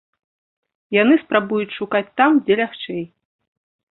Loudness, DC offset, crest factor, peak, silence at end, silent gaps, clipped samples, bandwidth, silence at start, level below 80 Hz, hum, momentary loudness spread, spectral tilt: -18 LUFS; under 0.1%; 20 dB; -2 dBFS; 0.9 s; none; under 0.1%; 4.1 kHz; 0.9 s; -64 dBFS; none; 13 LU; -10 dB/octave